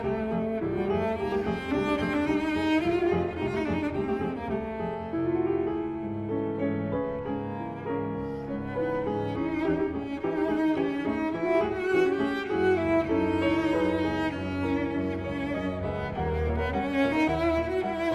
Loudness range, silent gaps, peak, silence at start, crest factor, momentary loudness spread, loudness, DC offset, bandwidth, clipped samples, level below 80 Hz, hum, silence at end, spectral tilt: 5 LU; none; -14 dBFS; 0 s; 14 dB; 7 LU; -28 LUFS; under 0.1%; 10.5 kHz; under 0.1%; -46 dBFS; none; 0 s; -7.5 dB/octave